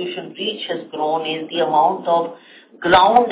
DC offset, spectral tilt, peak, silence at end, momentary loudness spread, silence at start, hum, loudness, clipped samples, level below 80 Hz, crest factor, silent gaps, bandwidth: under 0.1%; -8 dB/octave; 0 dBFS; 0 s; 13 LU; 0 s; none; -18 LUFS; under 0.1%; -52 dBFS; 18 dB; none; 4 kHz